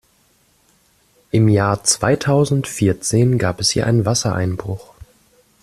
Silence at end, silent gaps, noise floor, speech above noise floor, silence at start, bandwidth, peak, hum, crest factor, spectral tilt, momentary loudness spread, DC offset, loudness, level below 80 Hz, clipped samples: 0.8 s; none; -58 dBFS; 42 dB; 1.35 s; 13.5 kHz; 0 dBFS; none; 18 dB; -5 dB/octave; 7 LU; under 0.1%; -17 LUFS; -48 dBFS; under 0.1%